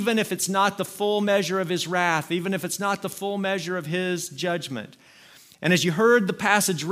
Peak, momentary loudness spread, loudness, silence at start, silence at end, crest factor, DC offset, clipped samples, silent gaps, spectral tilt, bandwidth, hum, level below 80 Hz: -4 dBFS; 9 LU; -24 LUFS; 0 s; 0 s; 20 dB; under 0.1%; under 0.1%; none; -4 dB/octave; 16 kHz; none; -70 dBFS